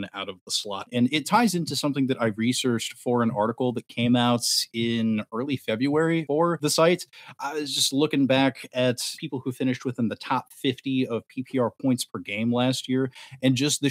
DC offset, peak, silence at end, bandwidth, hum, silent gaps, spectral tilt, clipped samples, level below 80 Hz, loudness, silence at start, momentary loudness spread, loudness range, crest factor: under 0.1%; -6 dBFS; 0 s; 16 kHz; none; 0.41-0.46 s; -4.5 dB/octave; under 0.1%; -74 dBFS; -25 LUFS; 0 s; 8 LU; 4 LU; 18 dB